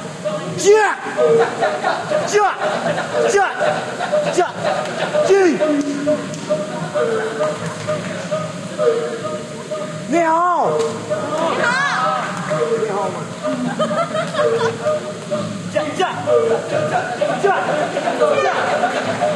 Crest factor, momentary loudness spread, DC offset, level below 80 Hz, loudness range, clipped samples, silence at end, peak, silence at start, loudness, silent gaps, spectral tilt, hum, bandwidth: 16 dB; 9 LU; under 0.1%; -62 dBFS; 4 LU; under 0.1%; 0 s; -2 dBFS; 0 s; -18 LUFS; none; -4.5 dB/octave; none; 12.5 kHz